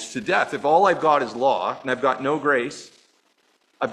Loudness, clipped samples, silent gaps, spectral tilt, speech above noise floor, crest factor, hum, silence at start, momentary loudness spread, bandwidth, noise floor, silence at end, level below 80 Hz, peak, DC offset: -21 LUFS; under 0.1%; none; -4.5 dB/octave; 43 dB; 18 dB; none; 0 s; 9 LU; 11.5 kHz; -64 dBFS; 0 s; -68 dBFS; -4 dBFS; under 0.1%